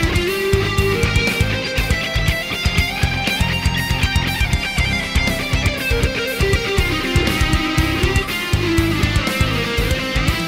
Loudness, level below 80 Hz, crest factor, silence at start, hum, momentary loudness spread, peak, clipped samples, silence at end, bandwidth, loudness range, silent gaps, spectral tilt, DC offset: -18 LUFS; -24 dBFS; 14 dB; 0 s; none; 2 LU; -2 dBFS; under 0.1%; 0 s; 16.5 kHz; 1 LU; none; -4.5 dB/octave; under 0.1%